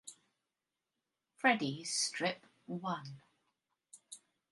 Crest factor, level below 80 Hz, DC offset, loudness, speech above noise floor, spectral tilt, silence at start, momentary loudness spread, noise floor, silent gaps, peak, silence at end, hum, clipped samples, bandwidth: 26 dB; -86 dBFS; under 0.1%; -35 LUFS; 54 dB; -3 dB/octave; 0.05 s; 23 LU; -90 dBFS; none; -14 dBFS; 0.35 s; none; under 0.1%; 11.5 kHz